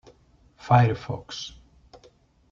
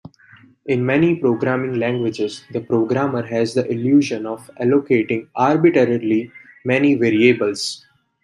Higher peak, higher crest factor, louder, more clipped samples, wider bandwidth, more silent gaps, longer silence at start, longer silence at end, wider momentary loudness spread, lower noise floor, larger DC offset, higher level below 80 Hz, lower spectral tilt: second, -6 dBFS vs -2 dBFS; first, 22 dB vs 16 dB; second, -24 LUFS vs -18 LUFS; neither; second, 7.4 kHz vs 11.5 kHz; neither; about the same, 0.65 s vs 0.65 s; first, 1.05 s vs 0.45 s; first, 19 LU vs 11 LU; first, -58 dBFS vs -49 dBFS; neither; first, -54 dBFS vs -62 dBFS; about the same, -6.5 dB/octave vs -6.5 dB/octave